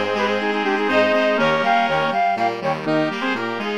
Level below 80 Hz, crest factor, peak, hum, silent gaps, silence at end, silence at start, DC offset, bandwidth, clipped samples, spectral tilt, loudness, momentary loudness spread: -60 dBFS; 16 dB; -4 dBFS; none; none; 0 s; 0 s; 0.5%; 13 kHz; under 0.1%; -5 dB/octave; -19 LUFS; 5 LU